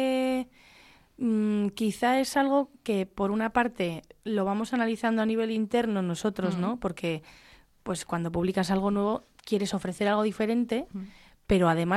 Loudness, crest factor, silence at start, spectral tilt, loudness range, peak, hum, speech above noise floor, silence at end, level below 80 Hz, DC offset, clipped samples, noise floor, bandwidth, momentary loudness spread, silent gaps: -28 LUFS; 16 dB; 0 s; -6 dB/octave; 3 LU; -12 dBFS; none; 29 dB; 0 s; -54 dBFS; under 0.1%; under 0.1%; -56 dBFS; 14.5 kHz; 8 LU; none